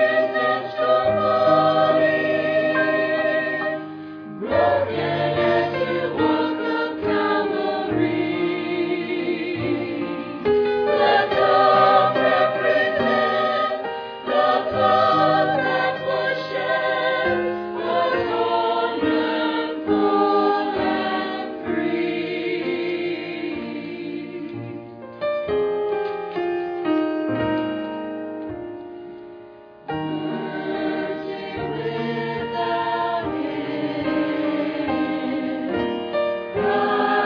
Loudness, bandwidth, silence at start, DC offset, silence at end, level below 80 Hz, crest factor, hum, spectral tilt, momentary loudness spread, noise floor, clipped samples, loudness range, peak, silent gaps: -21 LUFS; 5.4 kHz; 0 s; under 0.1%; 0 s; -56 dBFS; 18 dB; none; -7.5 dB/octave; 12 LU; -43 dBFS; under 0.1%; 9 LU; -4 dBFS; none